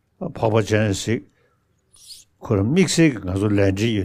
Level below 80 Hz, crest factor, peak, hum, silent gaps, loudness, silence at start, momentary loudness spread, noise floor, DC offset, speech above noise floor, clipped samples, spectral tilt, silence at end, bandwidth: -50 dBFS; 18 dB; -4 dBFS; none; none; -20 LUFS; 0.2 s; 21 LU; -64 dBFS; under 0.1%; 45 dB; under 0.1%; -5.5 dB/octave; 0 s; 15.5 kHz